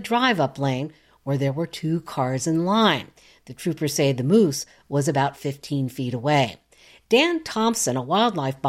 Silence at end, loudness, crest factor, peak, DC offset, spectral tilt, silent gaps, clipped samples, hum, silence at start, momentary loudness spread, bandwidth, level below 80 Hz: 0 s; -23 LUFS; 16 dB; -6 dBFS; under 0.1%; -5 dB/octave; none; under 0.1%; none; 0 s; 10 LU; 16 kHz; -62 dBFS